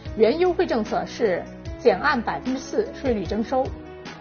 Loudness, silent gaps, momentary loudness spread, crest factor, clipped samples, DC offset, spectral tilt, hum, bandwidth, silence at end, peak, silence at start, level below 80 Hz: -23 LUFS; none; 10 LU; 18 dB; under 0.1%; under 0.1%; -4.5 dB/octave; none; 6.8 kHz; 0 s; -6 dBFS; 0 s; -42 dBFS